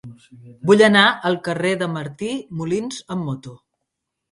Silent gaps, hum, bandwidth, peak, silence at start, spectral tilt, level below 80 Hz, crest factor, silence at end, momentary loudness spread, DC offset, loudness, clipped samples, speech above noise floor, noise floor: none; none; 11.5 kHz; 0 dBFS; 0.05 s; -5 dB/octave; -60 dBFS; 20 dB; 0.75 s; 15 LU; under 0.1%; -19 LUFS; under 0.1%; 60 dB; -79 dBFS